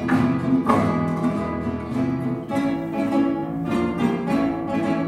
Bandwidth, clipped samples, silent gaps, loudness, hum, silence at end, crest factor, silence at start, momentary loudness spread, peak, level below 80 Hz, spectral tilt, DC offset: 12.5 kHz; under 0.1%; none; -23 LUFS; none; 0 s; 18 dB; 0 s; 6 LU; -4 dBFS; -46 dBFS; -8 dB/octave; under 0.1%